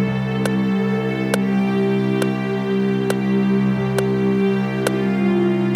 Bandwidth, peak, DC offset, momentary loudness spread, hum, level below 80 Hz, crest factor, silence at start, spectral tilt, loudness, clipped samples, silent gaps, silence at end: 15 kHz; -2 dBFS; under 0.1%; 3 LU; none; -50 dBFS; 16 dB; 0 s; -7 dB/octave; -19 LUFS; under 0.1%; none; 0 s